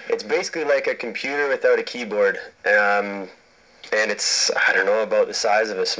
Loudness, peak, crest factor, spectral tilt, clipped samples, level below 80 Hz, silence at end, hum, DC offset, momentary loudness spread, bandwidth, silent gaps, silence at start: -20 LUFS; -6 dBFS; 16 dB; -1 dB/octave; under 0.1%; -70 dBFS; 0 s; none; under 0.1%; 8 LU; 8 kHz; none; 0 s